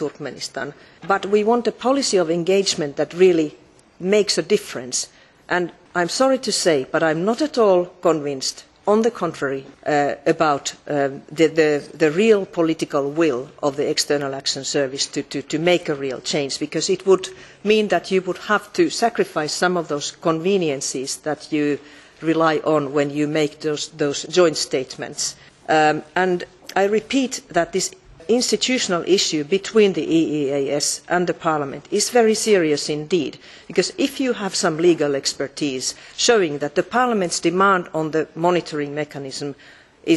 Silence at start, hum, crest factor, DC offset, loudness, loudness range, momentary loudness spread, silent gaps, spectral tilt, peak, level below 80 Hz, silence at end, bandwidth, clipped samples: 0 s; none; 18 dB; under 0.1%; -20 LUFS; 2 LU; 9 LU; none; -3.5 dB/octave; -2 dBFS; -60 dBFS; 0 s; 12.5 kHz; under 0.1%